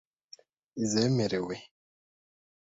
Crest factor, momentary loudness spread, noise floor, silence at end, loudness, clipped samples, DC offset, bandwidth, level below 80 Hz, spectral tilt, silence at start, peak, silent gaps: 18 dB; 15 LU; -57 dBFS; 0.95 s; -30 LUFS; under 0.1%; under 0.1%; 8 kHz; -66 dBFS; -5 dB/octave; 0.75 s; -16 dBFS; none